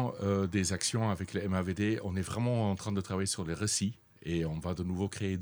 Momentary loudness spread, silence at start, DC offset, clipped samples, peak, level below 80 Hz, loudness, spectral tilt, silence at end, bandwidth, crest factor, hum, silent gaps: 5 LU; 0 s; under 0.1%; under 0.1%; -14 dBFS; -56 dBFS; -33 LUFS; -5 dB/octave; 0 s; over 20 kHz; 18 dB; none; none